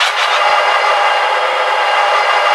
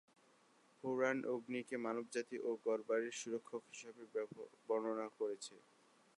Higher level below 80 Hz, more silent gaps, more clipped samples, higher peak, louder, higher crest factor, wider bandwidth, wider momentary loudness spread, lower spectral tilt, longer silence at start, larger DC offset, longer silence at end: first, -72 dBFS vs under -90 dBFS; neither; neither; first, 0 dBFS vs -24 dBFS; first, -12 LUFS vs -43 LUFS; second, 12 dB vs 20 dB; about the same, 12 kHz vs 11.5 kHz; second, 2 LU vs 12 LU; second, 2 dB/octave vs -4 dB/octave; second, 0 s vs 0.85 s; neither; second, 0 s vs 0.6 s